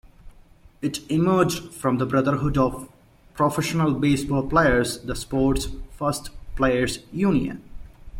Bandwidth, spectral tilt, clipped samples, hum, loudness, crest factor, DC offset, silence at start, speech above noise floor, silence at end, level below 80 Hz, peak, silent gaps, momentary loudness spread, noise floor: 16.5 kHz; -6 dB/octave; under 0.1%; none; -23 LUFS; 18 dB; under 0.1%; 0.25 s; 28 dB; 0 s; -38 dBFS; -6 dBFS; none; 11 LU; -51 dBFS